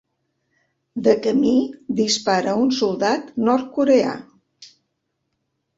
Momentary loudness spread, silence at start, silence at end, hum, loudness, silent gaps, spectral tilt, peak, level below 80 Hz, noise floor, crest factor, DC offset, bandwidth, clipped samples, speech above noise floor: 7 LU; 0.95 s; 1.15 s; none; -19 LUFS; none; -4.5 dB/octave; -2 dBFS; -62 dBFS; -75 dBFS; 18 dB; under 0.1%; 8 kHz; under 0.1%; 56 dB